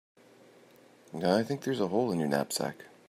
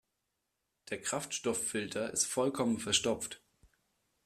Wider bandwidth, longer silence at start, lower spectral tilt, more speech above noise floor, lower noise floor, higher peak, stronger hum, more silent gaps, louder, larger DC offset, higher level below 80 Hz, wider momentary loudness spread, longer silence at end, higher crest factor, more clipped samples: about the same, 15.5 kHz vs 15.5 kHz; first, 1.15 s vs 0.85 s; first, -5 dB/octave vs -2.5 dB/octave; second, 28 dB vs 50 dB; second, -58 dBFS vs -84 dBFS; about the same, -12 dBFS vs -14 dBFS; neither; neither; first, -30 LUFS vs -34 LUFS; neither; second, -74 dBFS vs -68 dBFS; second, 6 LU vs 10 LU; second, 0.2 s vs 0.9 s; about the same, 20 dB vs 22 dB; neither